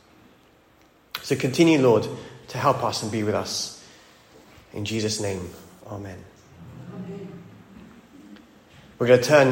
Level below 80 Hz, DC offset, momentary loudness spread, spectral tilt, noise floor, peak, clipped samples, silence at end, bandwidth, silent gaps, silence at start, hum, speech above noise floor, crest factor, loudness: -62 dBFS; under 0.1%; 24 LU; -5 dB/octave; -57 dBFS; -4 dBFS; under 0.1%; 0 s; 16.5 kHz; none; 1.15 s; none; 35 dB; 22 dB; -22 LUFS